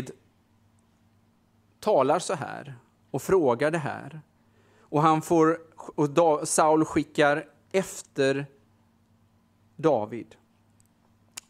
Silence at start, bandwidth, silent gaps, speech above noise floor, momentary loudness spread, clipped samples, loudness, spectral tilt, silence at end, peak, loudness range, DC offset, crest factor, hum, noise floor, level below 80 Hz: 0 s; 15.5 kHz; none; 40 dB; 17 LU; under 0.1%; -25 LUFS; -5 dB/octave; 1.25 s; -6 dBFS; 7 LU; under 0.1%; 22 dB; none; -64 dBFS; -64 dBFS